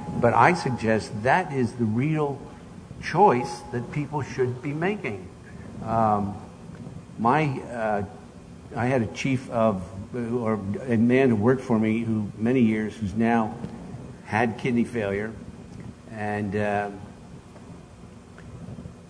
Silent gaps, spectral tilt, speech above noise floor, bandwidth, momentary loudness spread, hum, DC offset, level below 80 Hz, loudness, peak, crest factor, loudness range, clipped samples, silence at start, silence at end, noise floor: none; -7 dB/octave; 21 dB; 10.5 kHz; 22 LU; none; under 0.1%; -52 dBFS; -25 LUFS; -2 dBFS; 24 dB; 6 LU; under 0.1%; 0 s; 0 s; -45 dBFS